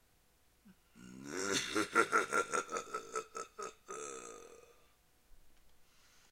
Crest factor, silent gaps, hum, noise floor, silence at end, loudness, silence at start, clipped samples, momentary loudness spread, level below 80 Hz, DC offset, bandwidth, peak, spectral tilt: 24 dB; none; none; -70 dBFS; 0.5 s; -37 LUFS; 0.65 s; under 0.1%; 21 LU; -72 dBFS; under 0.1%; 16.5 kHz; -16 dBFS; -2 dB/octave